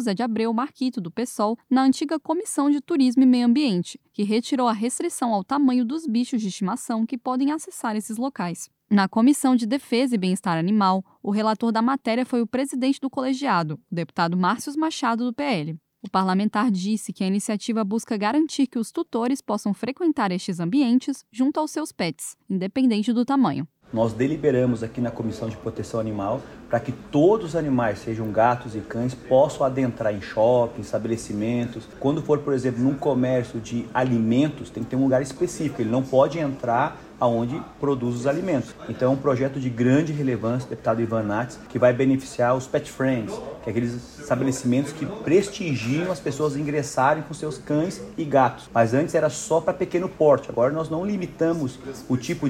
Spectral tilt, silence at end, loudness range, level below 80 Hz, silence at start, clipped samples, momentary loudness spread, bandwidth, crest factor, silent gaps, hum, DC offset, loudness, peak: -6 dB/octave; 0 s; 3 LU; -56 dBFS; 0 s; under 0.1%; 8 LU; 14.5 kHz; 18 dB; none; none; under 0.1%; -23 LUFS; -6 dBFS